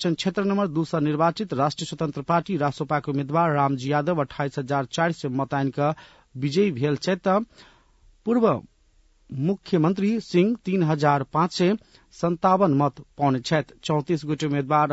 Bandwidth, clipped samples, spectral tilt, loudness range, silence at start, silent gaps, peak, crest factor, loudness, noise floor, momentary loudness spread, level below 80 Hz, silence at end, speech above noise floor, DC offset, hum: 8 kHz; under 0.1%; -7 dB/octave; 3 LU; 0 s; none; -6 dBFS; 18 dB; -24 LUFS; -60 dBFS; 7 LU; -60 dBFS; 0 s; 37 dB; under 0.1%; none